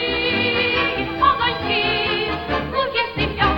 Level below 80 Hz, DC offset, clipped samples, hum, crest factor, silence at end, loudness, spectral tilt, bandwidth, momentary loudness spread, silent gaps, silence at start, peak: -38 dBFS; under 0.1%; under 0.1%; none; 16 dB; 0 s; -19 LUFS; -6.5 dB/octave; 16 kHz; 5 LU; none; 0 s; -4 dBFS